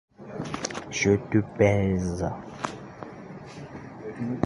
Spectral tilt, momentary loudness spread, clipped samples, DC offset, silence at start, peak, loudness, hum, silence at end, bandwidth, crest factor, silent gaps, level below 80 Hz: -6 dB/octave; 19 LU; under 0.1%; under 0.1%; 0.2 s; -8 dBFS; -27 LUFS; none; 0 s; 11.5 kHz; 20 dB; none; -48 dBFS